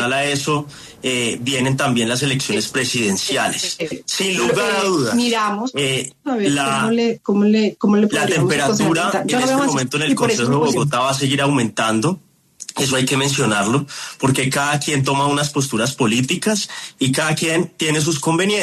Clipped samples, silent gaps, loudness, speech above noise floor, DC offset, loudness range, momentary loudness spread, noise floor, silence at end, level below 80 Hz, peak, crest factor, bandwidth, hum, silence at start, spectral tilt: under 0.1%; none; -18 LUFS; 20 dB; under 0.1%; 2 LU; 5 LU; -38 dBFS; 0 s; -56 dBFS; -2 dBFS; 14 dB; 13.5 kHz; none; 0 s; -4 dB/octave